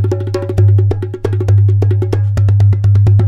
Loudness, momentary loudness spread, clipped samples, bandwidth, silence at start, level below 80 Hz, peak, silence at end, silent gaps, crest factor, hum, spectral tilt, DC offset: -12 LUFS; 7 LU; under 0.1%; 5.8 kHz; 0 s; -30 dBFS; -2 dBFS; 0 s; none; 8 dB; none; -9.5 dB/octave; under 0.1%